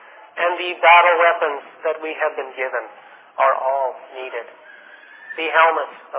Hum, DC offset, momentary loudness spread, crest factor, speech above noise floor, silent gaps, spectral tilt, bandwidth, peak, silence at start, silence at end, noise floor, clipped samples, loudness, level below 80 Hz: none; under 0.1%; 21 LU; 18 dB; 25 dB; none; -3.5 dB/octave; 4 kHz; 0 dBFS; 0.35 s; 0 s; -44 dBFS; under 0.1%; -18 LUFS; under -90 dBFS